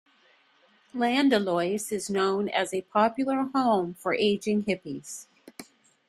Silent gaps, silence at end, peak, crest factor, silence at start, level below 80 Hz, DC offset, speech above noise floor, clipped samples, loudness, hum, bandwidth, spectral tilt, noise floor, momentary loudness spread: none; 0.45 s; -10 dBFS; 18 dB; 0.95 s; -70 dBFS; under 0.1%; 37 dB; under 0.1%; -26 LUFS; none; 14.5 kHz; -4.5 dB/octave; -63 dBFS; 17 LU